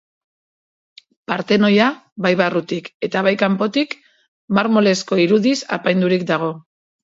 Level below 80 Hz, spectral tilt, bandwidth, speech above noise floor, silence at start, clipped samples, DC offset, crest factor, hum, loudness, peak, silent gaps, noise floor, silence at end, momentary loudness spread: -64 dBFS; -5.5 dB/octave; 7.8 kHz; over 73 dB; 1.3 s; under 0.1%; under 0.1%; 18 dB; none; -18 LUFS; -2 dBFS; 2.12-2.16 s, 2.94-3.00 s, 4.28-4.48 s; under -90 dBFS; 0.45 s; 11 LU